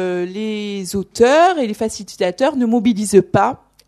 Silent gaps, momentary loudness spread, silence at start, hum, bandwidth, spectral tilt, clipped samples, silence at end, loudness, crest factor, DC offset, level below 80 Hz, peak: none; 11 LU; 0 s; none; 13.5 kHz; -5 dB/octave; under 0.1%; 0.3 s; -17 LUFS; 16 dB; under 0.1%; -50 dBFS; 0 dBFS